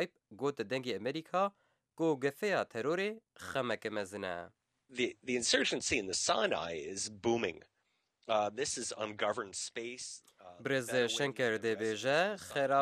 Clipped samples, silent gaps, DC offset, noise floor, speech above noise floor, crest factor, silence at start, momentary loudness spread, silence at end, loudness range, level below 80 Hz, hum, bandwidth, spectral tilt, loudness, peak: under 0.1%; none; under 0.1%; -80 dBFS; 45 dB; 20 dB; 0 s; 10 LU; 0 s; 3 LU; -72 dBFS; none; 15.5 kHz; -3 dB/octave; -35 LUFS; -16 dBFS